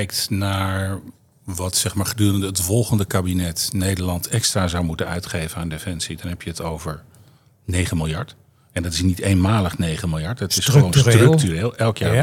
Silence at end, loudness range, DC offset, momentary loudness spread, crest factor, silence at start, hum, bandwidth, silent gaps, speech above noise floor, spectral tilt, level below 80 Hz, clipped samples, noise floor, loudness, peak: 0 s; 9 LU; under 0.1%; 14 LU; 20 dB; 0 s; none; 17 kHz; none; 32 dB; -5 dB/octave; -44 dBFS; under 0.1%; -52 dBFS; -20 LUFS; 0 dBFS